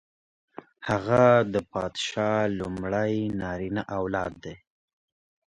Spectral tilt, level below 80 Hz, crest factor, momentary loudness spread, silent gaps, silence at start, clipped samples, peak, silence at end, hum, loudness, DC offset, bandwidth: -6 dB/octave; -54 dBFS; 22 dB; 13 LU; none; 0.8 s; under 0.1%; -6 dBFS; 0.95 s; none; -26 LUFS; under 0.1%; 10 kHz